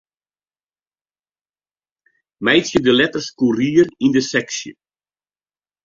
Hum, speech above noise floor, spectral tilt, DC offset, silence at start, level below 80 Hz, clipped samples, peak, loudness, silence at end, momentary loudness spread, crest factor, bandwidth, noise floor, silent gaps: 50 Hz at -50 dBFS; over 74 dB; -4 dB/octave; under 0.1%; 2.4 s; -56 dBFS; under 0.1%; 0 dBFS; -17 LUFS; 1.15 s; 10 LU; 20 dB; 7.6 kHz; under -90 dBFS; none